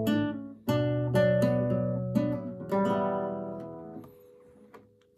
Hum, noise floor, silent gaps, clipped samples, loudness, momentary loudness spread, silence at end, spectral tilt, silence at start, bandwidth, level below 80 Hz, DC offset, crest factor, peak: none; -56 dBFS; none; under 0.1%; -29 LUFS; 16 LU; 0.4 s; -8 dB/octave; 0 s; 14.5 kHz; -58 dBFS; under 0.1%; 16 dB; -12 dBFS